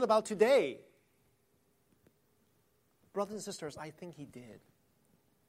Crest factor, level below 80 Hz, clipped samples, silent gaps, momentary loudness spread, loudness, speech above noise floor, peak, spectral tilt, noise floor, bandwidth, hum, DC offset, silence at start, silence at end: 22 dB; -80 dBFS; under 0.1%; none; 23 LU; -32 LUFS; 41 dB; -16 dBFS; -4.5 dB/octave; -74 dBFS; 15.5 kHz; none; under 0.1%; 0 s; 0.9 s